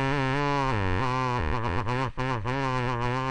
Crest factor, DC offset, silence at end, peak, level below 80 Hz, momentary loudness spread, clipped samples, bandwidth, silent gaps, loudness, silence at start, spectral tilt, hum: 16 dB; under 0.1%; 0 s; -12 dBFS; -38 dBFS; 3 LU; under 0.1%; 9.8 kHz; none; -28 LUFS; 0 s; -6.5 dB/octave; none